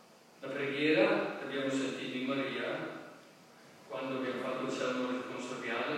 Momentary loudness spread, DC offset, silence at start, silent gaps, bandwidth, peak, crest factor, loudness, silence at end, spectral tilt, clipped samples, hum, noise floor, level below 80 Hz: 14 LU; under 0.1%; 0.1 s; none; 15 kHz; -14 dBFS; 20 dB; -35 LUFS; 0 s; -4.5 dB/octave; under 0.1%; none; -57 dBFS; under -90 dBFS